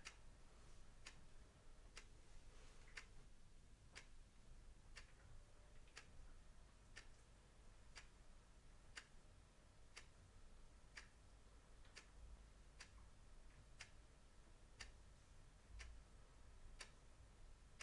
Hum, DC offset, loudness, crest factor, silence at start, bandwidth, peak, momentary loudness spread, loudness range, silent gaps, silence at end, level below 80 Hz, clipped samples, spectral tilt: none; under 0.1%; -65 LUFS; 24 dB; 0 s; 11 kHz; -38 dBFS; 8 LU; 2 LU; none; 0 s; -66 dBFS; under 0.1%; -3 dB/octave